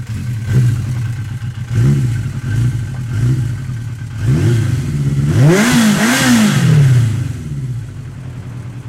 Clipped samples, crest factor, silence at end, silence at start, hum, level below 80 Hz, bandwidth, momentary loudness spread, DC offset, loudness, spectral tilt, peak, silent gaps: under 0.1%; 12 dB; 0 s; 0 s; none; -34 dBFS; 16 kHz; 14 LU; under 0.1%; -14 LUFS; -6 dB/octave; -2 dBFS; none